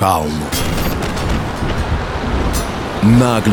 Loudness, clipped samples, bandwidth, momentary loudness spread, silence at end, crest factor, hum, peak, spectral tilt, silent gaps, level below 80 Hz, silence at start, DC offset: -17 LUFS; under 0.1%; 19.5 kHz; 8 LU; 0 s; 16 dB; none; 0 dBFS; -5.5 dB/octave; none; -24 dBFS; 0 s; under 0.1%